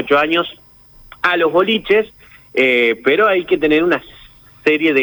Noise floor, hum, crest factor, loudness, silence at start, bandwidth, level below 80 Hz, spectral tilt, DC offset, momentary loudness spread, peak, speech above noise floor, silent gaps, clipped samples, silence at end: -43 dBFS; none; 14 dB; -15 LUFS; 0 s; over 20 kHz; -50 dBFS; -5.5 dB/octave; under 0.1%; 7 LU; -2 dBFS; 28 dB; none; under 0.1%; 0 s